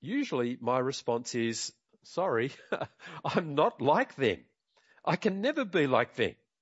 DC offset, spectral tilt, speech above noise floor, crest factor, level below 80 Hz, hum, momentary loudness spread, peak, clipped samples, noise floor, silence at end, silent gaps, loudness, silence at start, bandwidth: under 0.1%; -5 dB/octave; 37 dB; 20 dB; -74 dBFS; none; 10 LU; -10 dBFS; under 0.1%; -67 dBFS; 0.3 s; none; -31 LUFS; 0 s; 8.2 kHz